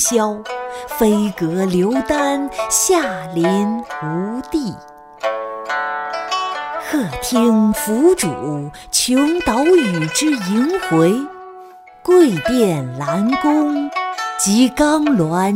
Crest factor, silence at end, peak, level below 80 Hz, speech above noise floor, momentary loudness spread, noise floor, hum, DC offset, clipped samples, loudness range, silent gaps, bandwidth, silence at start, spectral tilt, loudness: 14 dB; 0 s; -2 dBFS; -46 dBFS; 24 dB; 10 LU; -39 dBFS; none; under 0.1%; under 0.1%; 6 LU; none; 16.5 kHz; 0 s; -4.5 dB/octave; -17 LUFS